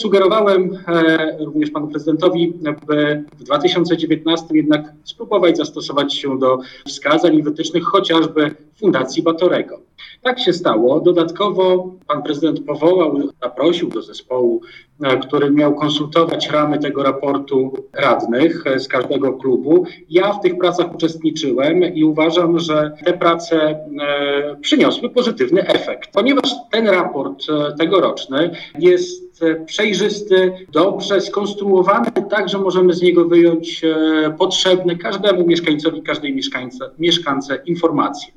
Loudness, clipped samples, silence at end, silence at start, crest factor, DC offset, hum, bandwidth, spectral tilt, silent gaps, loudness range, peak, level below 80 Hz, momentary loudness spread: -16 LUFS; under 0.1%; 0.1 s; 0 s; 16 dB; under 0.1%; none; 8 kHz; -5 dB/octave; none; 3 LU; 0 dBFS; -60 dBFS; 7 LU